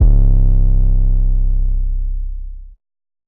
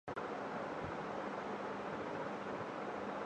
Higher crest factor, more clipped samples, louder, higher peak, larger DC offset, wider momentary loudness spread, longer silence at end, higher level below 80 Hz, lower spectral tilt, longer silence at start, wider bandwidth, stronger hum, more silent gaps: about the same, 12 dB vs 14 dB; neither; first, -18 LUFS vs -43 LUFS; first, -2 dBFS vs -30 dBFS; neither; first, 14 LU vs 1 LU; first, 0.6 s vs 0 s; first, -12 dBFS vs -70 dBFS; first, -14 dB/octave vs -6 dB/octave; about the same, 0 s vs 0.05 s; second, 1 kHz vs 10 kHz; neither; neither